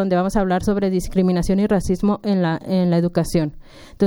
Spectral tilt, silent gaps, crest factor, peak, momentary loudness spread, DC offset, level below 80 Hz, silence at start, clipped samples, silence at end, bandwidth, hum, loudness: -7 dB/octave; none; 14 dB; -4 dBFS; 2 LU; under 0.1%; -34 dBFS; 0 s; under 0.1%; 0 s; 16.5 kHz; none; -19 LUFS